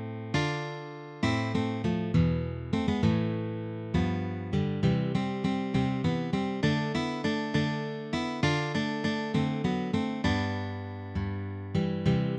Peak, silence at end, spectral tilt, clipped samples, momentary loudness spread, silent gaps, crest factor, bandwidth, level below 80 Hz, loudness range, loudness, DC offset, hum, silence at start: -14 dBFS; 0 s; -7 dB/octave; under 0.1%; 8 LU; none; 16 dB; 9.4 kHz; -48 dBFS; 1 LU; -30 LUFS; under 0.1%; none; 0 s